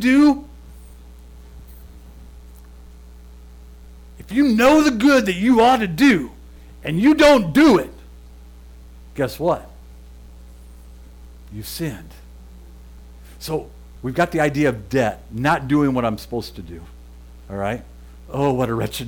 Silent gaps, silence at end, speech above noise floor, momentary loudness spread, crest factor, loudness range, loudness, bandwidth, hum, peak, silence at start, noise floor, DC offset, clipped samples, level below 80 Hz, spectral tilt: none; 0 s; 24 dB; 20 LU; 14 dB; 17 LU; -18 LUFS; 18 kHz; none; -6 dBFS; 0 s; -41 dBFS; under 0.1%; under 0.1%; -40 dBFS; -5.5 dB/octave